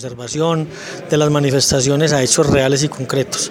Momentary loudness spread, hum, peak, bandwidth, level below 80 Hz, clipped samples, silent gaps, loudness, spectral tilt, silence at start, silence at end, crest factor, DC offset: 8 LU; none; 0 dBFS; 16.5 kHz; -40 dBFS; under 0.1%; none; -15 LUFS; -4 dB/octave; 0 s; 0 s; 16 dB; under 0.1%